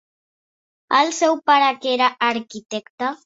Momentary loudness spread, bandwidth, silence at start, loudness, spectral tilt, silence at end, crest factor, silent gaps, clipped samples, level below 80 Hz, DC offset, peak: 13 LU; 8 kHz; 0.9 s; -18 LUFS; -2 dB/octave; 0.1 s; 18 dB; 2.66-2.70 s, 2.90-2.98 s; under 0.1%; -72 dBFS; under 0.1%; -2 dBFS